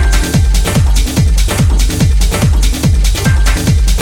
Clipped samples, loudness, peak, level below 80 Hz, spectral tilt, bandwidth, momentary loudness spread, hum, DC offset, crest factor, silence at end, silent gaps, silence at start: under 0.1%; -12 LUFS; 0 dBFS; -10 dBFS; -5 dB/octave; 18 kHz; 0 LU; none; under 0.1%; 8 dB; 0 s; none; 0 s